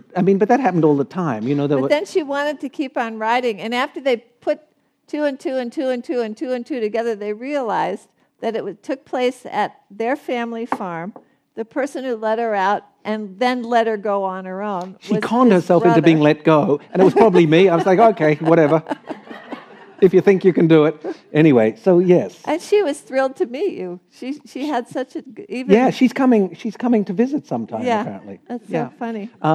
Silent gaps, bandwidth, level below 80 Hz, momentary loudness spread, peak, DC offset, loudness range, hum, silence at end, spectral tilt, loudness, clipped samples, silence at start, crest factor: none; 12.5 kHz; -66 dBFS; 15 LU; -2 dBFS; under 0.1%; 9 LU; none; 0 s; -7 dB/octave; -18 LUFS; under 0.1%; 0.15 s; 16 dB